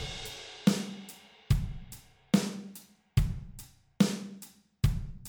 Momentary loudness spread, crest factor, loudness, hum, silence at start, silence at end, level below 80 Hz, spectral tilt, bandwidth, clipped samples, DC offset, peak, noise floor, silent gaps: 21 LU; 22 dB; -32 LUFS; none; 0 s; 0 s; -40 dBFS; -5.5 dB/octave; over 20 kHz; under 0.1%; under 0.1%; -12 dBFS; -53 dBFS; none